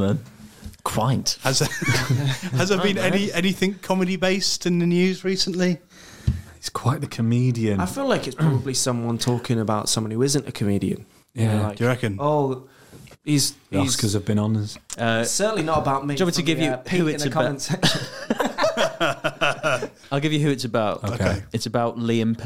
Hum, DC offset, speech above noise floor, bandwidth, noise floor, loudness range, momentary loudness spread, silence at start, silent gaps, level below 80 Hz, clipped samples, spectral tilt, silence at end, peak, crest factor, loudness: none; 0.6%; 24 dB; 16.5 kHz; -46 dBFS; 2 LU; 6 LU; 0 s; none; -48 dBFS; under 0.1%; -4.5 dB/octave; 0 s; -4 dBFS; 18 dB; -23 LUFS